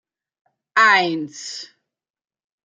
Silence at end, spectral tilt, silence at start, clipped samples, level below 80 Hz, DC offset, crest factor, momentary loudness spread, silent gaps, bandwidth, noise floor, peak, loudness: 1 s; -2.5 dB/octave; 0.75 s; under 0.1%; -80 dBFS; under 0.1%; 20 dB; 18 LU; none; 9.4 kHz; -79 dBFS; -2 dBFS; -16 LUFS